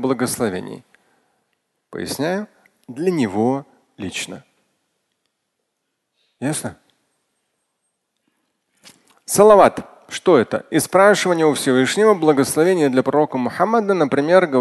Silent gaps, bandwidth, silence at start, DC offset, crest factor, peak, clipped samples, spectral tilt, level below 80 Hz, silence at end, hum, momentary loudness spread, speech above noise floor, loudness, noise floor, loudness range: none; 12.5 kHz; 0 s; under 0.1%; 18 dB; 0 dBFS; under 0.1%; -4.5 dB/octave; -58 dBFS; 0 s; none; 18 LU; 59 dB; -17 LUFS; -75 dBFS; 17 LU